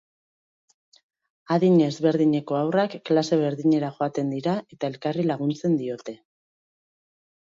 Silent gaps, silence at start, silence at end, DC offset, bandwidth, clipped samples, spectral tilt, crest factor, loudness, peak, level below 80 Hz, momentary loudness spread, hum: none; 1.5 s; 1.25 s; under 0.1%; 7.6 kHz; under 0.1%; -7.5 dB/octave; 16 dB; -24 LUFS; -8 dBFS; -70 dBFS; 9 LU; none